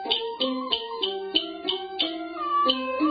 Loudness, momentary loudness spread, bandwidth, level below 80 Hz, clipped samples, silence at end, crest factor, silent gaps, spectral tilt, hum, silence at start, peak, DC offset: -26 LUFS; 6 LU; 5 kHz; -64 dBFS; under 0.1%; 0 s; 20 dB; none; -7 dB/octave; none; 0 s; -8 dBFS; under 0.1%